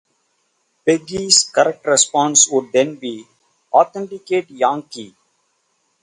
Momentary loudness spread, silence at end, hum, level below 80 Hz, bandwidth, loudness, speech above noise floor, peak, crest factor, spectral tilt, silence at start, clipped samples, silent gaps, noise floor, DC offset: 17 LU; 0.95 s; none; -62 dBFS; 11.5 kHz; -16 LUFS; 49 dB; 0 dBFS; 18 dB; -1.5 dB/octave; 0.85 s; under 0.1%; none; -66 dBFS; under 0.1%